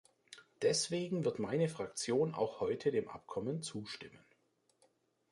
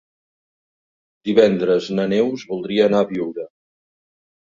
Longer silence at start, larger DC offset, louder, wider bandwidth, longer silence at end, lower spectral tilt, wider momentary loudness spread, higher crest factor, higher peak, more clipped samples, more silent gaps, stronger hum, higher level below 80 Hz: second, 0.3 s vs 1.25 s; neither; second, -37 LUFS vs -19 LUFS; first, 11.5 kHz vs 7.6 kHz; first, 1.15 s vs 0.95 s; second, -4.5 dB/octave vs -6.5 dB/octave; about the same, 15 LU vs 14 LU; about the same, 18 dB vs 20 dB; second, -22 dBFS vs -2 dBFS; neither; neither; neither; second, -74 dBFS vs -60 dBFS